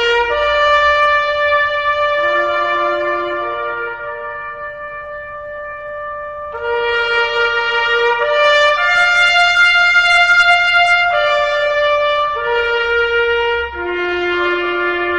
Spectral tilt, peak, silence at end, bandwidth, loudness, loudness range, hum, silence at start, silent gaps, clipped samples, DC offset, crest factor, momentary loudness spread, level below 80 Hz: -2.5 dB/octave; 0 dBFS; 0 s; 10 kHz; -13 LUFS; 12 LU; none; 0 s; none; under 0.1%; under 0.1%; 14 dB; 16 LU; -42 dBFS